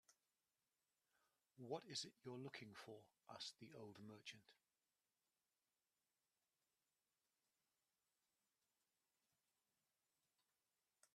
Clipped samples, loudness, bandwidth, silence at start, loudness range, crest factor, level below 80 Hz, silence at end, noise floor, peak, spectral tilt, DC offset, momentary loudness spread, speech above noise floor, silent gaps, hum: under 0.1%; -56 LUFS; 13.5 kHz; 0.1 s; 10 LU; 26 dB; under -90 dBFS; 0.1 s; under -90 dBFS; -36 dBFS; -3.5 dB/octave; under 0.1%; 13 LU; over 33 dB; none; none